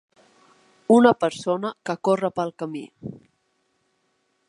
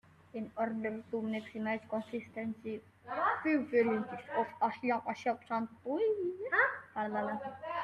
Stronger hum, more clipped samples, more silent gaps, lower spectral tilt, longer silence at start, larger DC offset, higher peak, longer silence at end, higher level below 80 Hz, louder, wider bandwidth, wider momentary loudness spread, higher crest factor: neither; neither; neither; about the same, -6 dB/octave vs -7 dB/octave; first, 0.9 s vs 0.35 s; neither; first, -2 dBFS vs -16 dBFS; first, 1.35 s vs 0 s; first, -70 dBFS vs -78 dBFS; first, -22 LUFS vs -35 LUFS; first, 11 kHz vs 9.8 kHz; first, 22 LU vs 11 LU; about the same, 22 dB vs 20 dB